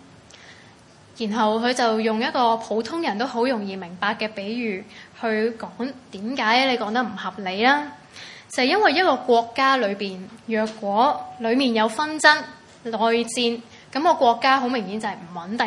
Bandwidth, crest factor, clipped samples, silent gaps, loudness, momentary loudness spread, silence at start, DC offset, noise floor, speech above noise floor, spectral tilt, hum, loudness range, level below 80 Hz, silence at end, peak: 11.5 kHz; 22 dB; under 0.1%; none; -22 LUFS; 14 LU; 0.4 s; under 0.1%; -49 dBFS; 28 dB; -3.5 dB/octave; none; 4 LU; -70 dBFS; 0 s; 0 dBFS